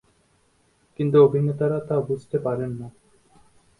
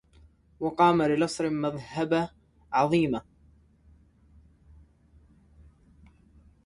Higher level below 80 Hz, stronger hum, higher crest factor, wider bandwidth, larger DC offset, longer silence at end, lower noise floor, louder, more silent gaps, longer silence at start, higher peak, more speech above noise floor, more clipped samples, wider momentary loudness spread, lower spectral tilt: about the same, -60 dBFS vs -58 dBFS; neither; about the same, 20 dB vs 22 dB; about the same, 10.5 kHz vs 11.5 kHz; neither; second, 0.9 s vs 3.45 s; about the same, -63 dBFS vs -60 dBFS; first, -22 LUFS vs -27 LUFS; neither; first, 1 s vs 0.6 s; first, -4 dBFS vs -8 dBFS; first, 42 dB vs 34 dB; neither; first, 15 LU vs 11 LU; first, -9.5 dB/octave vs -6 dB/octave